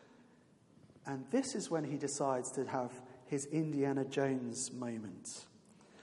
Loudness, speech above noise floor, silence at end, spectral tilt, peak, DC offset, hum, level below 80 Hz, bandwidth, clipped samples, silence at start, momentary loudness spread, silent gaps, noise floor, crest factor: -38 LUFS; 28 dB; 0 s; -5 dB/octave; -20 dBFS; under 0.1%; none; -82 dBFS; 11.5 kHz; under 0.1%; 0 s; 12 LU; none; -66 dBFS; 18 dB